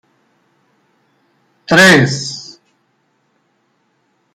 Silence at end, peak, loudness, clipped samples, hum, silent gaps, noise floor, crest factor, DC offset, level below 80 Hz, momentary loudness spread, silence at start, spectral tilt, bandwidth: 1.9 s; 0 dBFS; -10 LUFS; under 0.1%; none; none; -62 dBFS; 18 dB; under 0.1%; -56 dBFS; 28 LU; 1.7 s; -4 dB/octave; 16 kHz